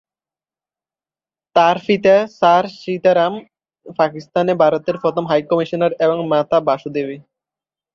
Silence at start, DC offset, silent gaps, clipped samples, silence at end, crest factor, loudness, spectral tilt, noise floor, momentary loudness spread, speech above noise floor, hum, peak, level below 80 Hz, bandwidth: 1.55 s; under 0.1%; none; under 0.1%; 0.75 s; 16 dB; -16 LUFS; -6.5 dB/octave; under -90 dBFS; 10 LU; over 74 dB; none; -2 dBFS; -62 dBFS; 7 kHz